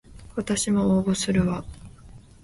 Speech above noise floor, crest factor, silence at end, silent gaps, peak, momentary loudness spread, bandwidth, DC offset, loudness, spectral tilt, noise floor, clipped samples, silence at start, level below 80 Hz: 24 dB; 16 dB; 0.25 s; none; -10 dBFS; 13 LU; 11.5 kHz; under 0.1%; -24 LUFS; -5 dB/octave; -47 dBFS; under 0.1%; 0.1 s; -44 dBFS